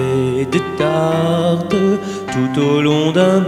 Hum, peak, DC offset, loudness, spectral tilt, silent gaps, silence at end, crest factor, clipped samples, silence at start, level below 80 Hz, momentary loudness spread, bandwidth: none; 0 dBFS; under 0.1%; -16 LUFS; -6.5 dB/octave; none; 0 s; 14 dB; under 0.1%; 0 s; -50 dBFS; 5 LU; 15 kHz